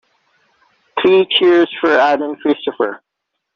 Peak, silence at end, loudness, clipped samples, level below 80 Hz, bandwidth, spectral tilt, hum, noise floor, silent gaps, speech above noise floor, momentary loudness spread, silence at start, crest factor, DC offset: -2 dBFS; 0.6 s; -14 LUFS; under 0.1%; -62 dBFS; 6.6 kHz; -1 dB/octave; none; -76 dBFS; none; 62 dB; 10 LU; 0.95 s; 14 dB; under 0.1%